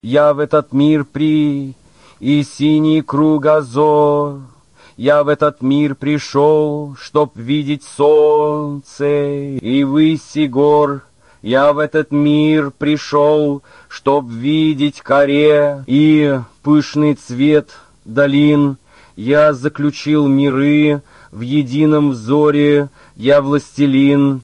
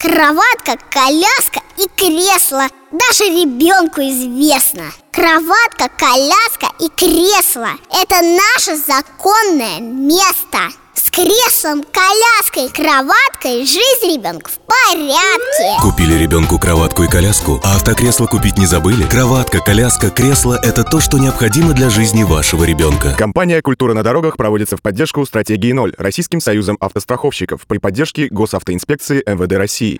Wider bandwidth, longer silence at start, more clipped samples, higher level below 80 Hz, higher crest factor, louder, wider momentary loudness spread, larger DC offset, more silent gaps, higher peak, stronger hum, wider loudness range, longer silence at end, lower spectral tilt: second, 9.6 kHz vs over 20 kHz; about the same, 0.05 s vs 0 s; neither; second, -54 dBFS vs -28 dBFS; about the same, 12 dB vs 12 dB; second, -14 LUFS vs -11 LUFS; about the same, 9 LU vs 8 LU; first, 0.2% vs under 0.1%; neither; about the same, -2 dBFS vs 0 dBFS; neither; second, 2 LU vs 5 LU; about the same, 0 s vs 0 s; first, -7.5 dB/octave vs -4 dB/octave